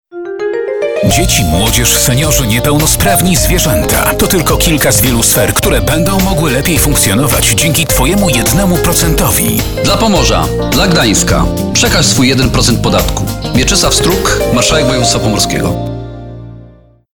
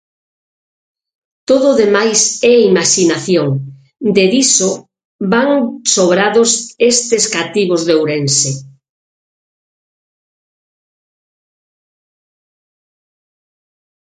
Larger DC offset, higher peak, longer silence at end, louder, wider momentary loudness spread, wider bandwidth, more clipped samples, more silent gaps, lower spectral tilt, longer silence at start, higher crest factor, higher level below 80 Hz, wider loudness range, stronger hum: neither; about the same, 0 dBFS vs 0 dBFS; second, 0.45 s vs 5.45 s; first, -9 LUFS vs -12 LUFS; about the same, 7 LU vs 9 LU; first, over 20 kHz vs 9.6 kHz; neither; second, none vs 5.05-5.19 s; about the same, -3.5 dB/octave vs -3 dB/octave; second, 0.1 s vs 1.5 s; second, 10 dB vs 16 dB; first, -20 dBFS vs -58 dBFS; second, 1 LU vs 6 LU; neither